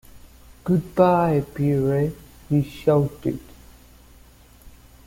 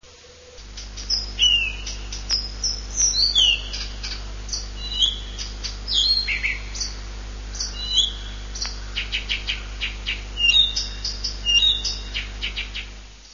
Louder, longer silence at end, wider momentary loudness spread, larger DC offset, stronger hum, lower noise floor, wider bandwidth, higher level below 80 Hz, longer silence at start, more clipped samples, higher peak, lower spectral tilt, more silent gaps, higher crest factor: about the same, -22 LUFS vs -21 LUFS; first, 0.4 s vs 0 s; second, 11 LU vs 17 LU; neither; second, none vs 50 Hz at -35 dBFS; first, -50 dBFS vs -46 dBFS; first, 16.5 kHz vs 7.4 kHz; second, -48 dBFS vs -34 dBFS; about the same, 0.15 s vs 0.05 s; neither; about the same, -4 dBFS vs -6 dBFS; first, -9 dB/octave vs 0 dB/octave; neither; about the same, 20 dB vs 18 dB